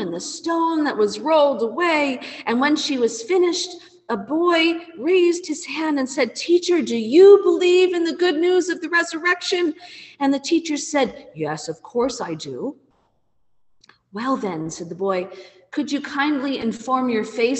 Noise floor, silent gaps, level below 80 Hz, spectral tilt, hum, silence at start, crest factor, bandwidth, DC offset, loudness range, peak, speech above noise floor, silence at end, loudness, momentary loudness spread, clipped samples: -67 dBFS; none; -64 dBFS; -3.5 dB/octave; none; 0 s; 18 dB; 8.6 kHz; under 0.1%; 12 LU; -2 dBFS; 48 dB; 0 s; -20 LUFS; 12 LU; under 0.1%